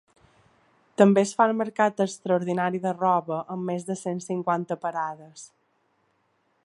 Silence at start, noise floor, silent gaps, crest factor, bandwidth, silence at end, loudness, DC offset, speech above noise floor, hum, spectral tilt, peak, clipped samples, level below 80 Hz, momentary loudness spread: 1 s; -70 dBFS; none; 24 dB; 11.5 kHz; 1.2 s; -25 LUFS; under 0.1%; 45 dB; none; -6 dB/octave; -4 dBFS; under 0.1%; -76 dBFS; 12 LU